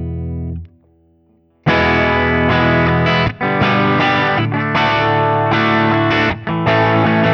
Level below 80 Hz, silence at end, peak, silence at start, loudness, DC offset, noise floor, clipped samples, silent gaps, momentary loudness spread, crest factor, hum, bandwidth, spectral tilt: -36 dBFS; 0 s; -2 dBFS; 0 s; -14 LUFS; under 0.1%; -55 dBFS; under 0.1%; none; 8 LU; 14 dB; none; 6.8 kHz; -7.5 dB/octave